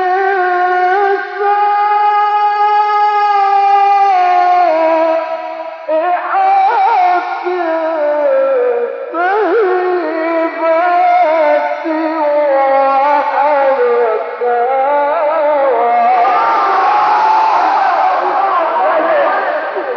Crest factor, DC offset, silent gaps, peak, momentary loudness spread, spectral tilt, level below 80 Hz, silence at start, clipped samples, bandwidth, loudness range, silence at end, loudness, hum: 10 dB; under 0.1%; none; -2 dBFS; 5 LU; 0.5 dB/octave; -72 dBFS; 0 s; under 0.1%; 6.6 kHz; 3 LU; 0 s; -12 LUFS; none